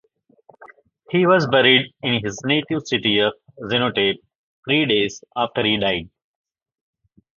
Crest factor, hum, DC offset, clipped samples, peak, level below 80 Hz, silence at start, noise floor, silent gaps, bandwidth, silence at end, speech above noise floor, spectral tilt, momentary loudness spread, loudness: 20 dB; none; under 0.1%; under 0.1%; 0 dBFS; -56 dBFS; 0.6 s; -54 dBFS; 4.35-4.63 s; 7.6 kHz; 1.3 s; 35 dB; -5 dB/octave; 10 LU; -19 LUFS